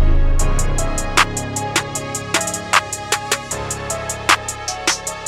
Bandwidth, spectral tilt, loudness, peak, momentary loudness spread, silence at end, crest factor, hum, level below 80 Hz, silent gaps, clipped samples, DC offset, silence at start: 16 kHz; -2.5 dB/octave; -19 LUFS; 0 dBFS; 7 LU; 0 s; 18 dB; none; -22 dBFS; none; under 0.1%; under 0.1%; 0 s